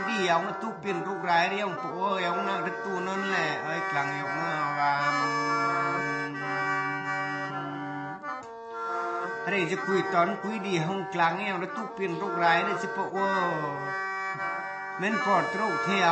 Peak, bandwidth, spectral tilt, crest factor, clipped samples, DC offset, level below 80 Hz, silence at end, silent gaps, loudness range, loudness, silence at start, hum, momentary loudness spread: -10 dBFS; 8.8 kHz; -5 dB/octave; 18 dB; under 0.1%; under 0.1%; -76 dBFS; 0 s; none; 4 LU; -28 LUFS; 0 s; none; 8 LU